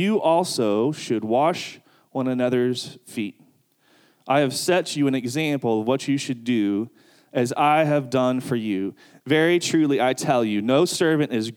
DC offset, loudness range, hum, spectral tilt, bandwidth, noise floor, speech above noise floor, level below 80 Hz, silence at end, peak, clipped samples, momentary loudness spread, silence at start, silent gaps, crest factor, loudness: under 0.1%; 4 LU; none; -5 dB/octave; 17.5 kHz; -61 dBFS; 39 dB; -76 dBFS; 0 s; -6 dBFS; under 0.1%; 11 LU; 0 s; none; 16 dB; -22 LUFS